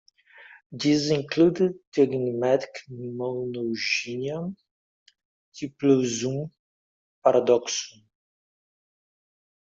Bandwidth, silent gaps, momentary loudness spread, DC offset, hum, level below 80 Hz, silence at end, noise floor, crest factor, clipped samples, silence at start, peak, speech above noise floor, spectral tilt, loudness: 7.8 kHz; 0.66-0.70 s, 1.87-1.92 s, 4.71-5.06 s, 5.25-5.52 s, 6.59-7.22 s; 16 LU; under 0.1%; none; -66 dBFS; 1.85 s; under -90 dBFS; 20 dB; under 0.1%; 0.4 s; -6 dBFS; over 66 dB; -5 dB/octave; -25 LUFS